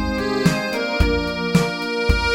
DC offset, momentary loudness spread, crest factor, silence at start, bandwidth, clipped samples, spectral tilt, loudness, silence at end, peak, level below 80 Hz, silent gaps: under 0.1%; 3 LU; 16 dB; 0 s; 17 kHz; under 0.1%; -5.5 dB/octave; -20 LUFS; 0 s; -4 dBFS; -26 dBFS; none